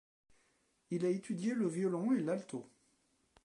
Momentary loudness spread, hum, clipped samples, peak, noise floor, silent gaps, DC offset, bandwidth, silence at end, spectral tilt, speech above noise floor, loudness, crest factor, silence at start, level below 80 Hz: 9 LU; none; under 0.1%; -24 dBFS; -76 dBFS; none; under 0.1%; 11.5 kHz; 0.8 s; -7 dB/octave; 40 dB; -36 LUFS; 14 dB; 0.9 s; -84 dBFS